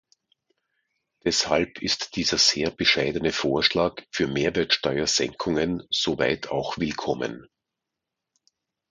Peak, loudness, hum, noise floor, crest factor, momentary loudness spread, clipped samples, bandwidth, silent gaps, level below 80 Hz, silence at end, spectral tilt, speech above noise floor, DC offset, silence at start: -4 dBFS; -24 LUFS; none; -85 dBFS; 22 dB; 8 LU; under 0.1%; 11 kHz; none; -52 dBFS; 1.45 s; -3 dB/octave; 61 dB; under 0.1%; 1.25 s